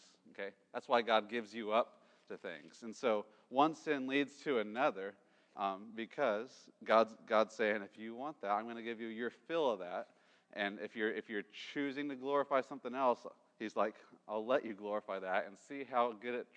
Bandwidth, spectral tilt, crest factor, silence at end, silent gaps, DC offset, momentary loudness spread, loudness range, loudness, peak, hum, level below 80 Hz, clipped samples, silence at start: 9.6 kHz; -5 dB/octave; 22 dB; 0.15 s; none; under 0.1%; 14 LU; 4 LU; -38 LUFS; -16 dBFS; none; under -90 dBFS; under 0.1%; 0.25 s